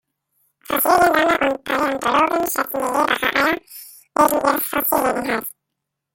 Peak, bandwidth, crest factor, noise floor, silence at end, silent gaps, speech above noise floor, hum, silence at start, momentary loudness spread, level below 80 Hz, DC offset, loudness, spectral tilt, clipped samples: -2 dBFS; 17 kHz; 18 dB; -80 dBFS; 0.65 s; none; 62 dB; none; 0.7 s; 10 LU; -52 dBFS; under 0.1%; -18 LUFS; -2.5 dB/octave; under 0.1%